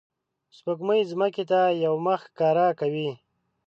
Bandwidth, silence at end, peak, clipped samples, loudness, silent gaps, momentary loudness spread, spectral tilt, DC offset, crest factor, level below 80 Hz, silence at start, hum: 7.6 kHz; 0.5 s; -12 dBFS; under 0.1%; -25 LUFS; none; 10 LU; -7.5 dB/octave; under 0.1%; 14 dB; -80 dBFS; 0.65 s; none